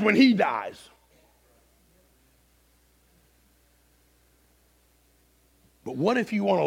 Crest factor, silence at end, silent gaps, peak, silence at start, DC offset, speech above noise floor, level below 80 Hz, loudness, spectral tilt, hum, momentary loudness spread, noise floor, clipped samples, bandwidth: 22 dB; 0 s; none; -6 dBFS; 0 s; under 0.1%; 40 dB; -66 dBFS; -24 LUFS; -6 dB/octave; 50 Hz at -80 dBFS; 22 LU; -63 dBFS; under 0.1%; 13.5 kHz